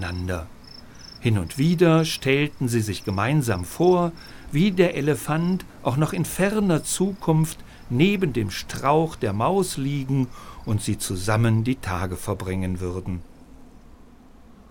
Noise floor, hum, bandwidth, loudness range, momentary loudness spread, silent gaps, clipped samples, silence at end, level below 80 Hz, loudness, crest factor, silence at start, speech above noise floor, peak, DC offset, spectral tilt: -47 dBFS; none; 19 kHz; 4 LU; 10 LU; none; under 0.1%; 0.25 s; -44 dBFS; -23 LUFS; 20 dB; 0 s; 25 dB; -4 dBFS; under 0.1%; -6 dB/octave